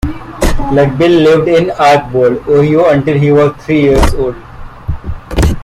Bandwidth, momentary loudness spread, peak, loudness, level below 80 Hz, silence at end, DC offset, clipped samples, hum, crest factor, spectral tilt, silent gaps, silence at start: 16 kHz; 14 LU; 0 dBFS; -10 LUFS; -20 dBFS; 0 s; under 0.1%; under 0.1%; none; 10 dB; -6.5 dB/octave; none; 0.05 s